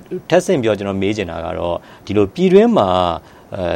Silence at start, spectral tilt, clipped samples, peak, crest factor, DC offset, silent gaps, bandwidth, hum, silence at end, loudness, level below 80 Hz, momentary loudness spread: 0.1 s; -6.5 dB/octave; under 0.1%; 0 dBFS; 16 dB; under 0.1%; none; 12.5 kHz; none; 0 s; -16 LUFS; -46 dBFS; 13 LU